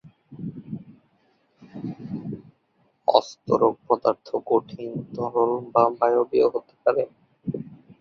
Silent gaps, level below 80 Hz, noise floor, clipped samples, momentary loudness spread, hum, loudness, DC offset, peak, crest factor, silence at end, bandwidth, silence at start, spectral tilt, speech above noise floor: none; -66 dBFS; -67 dBFS; under 0.1%; 17 LU; none; -24 LUFS; under 0.1%; -2 dBFS; 24 dB; 0.25 s; 6.8 kHz; 0.3 s; -7 dB/octave; 44 dB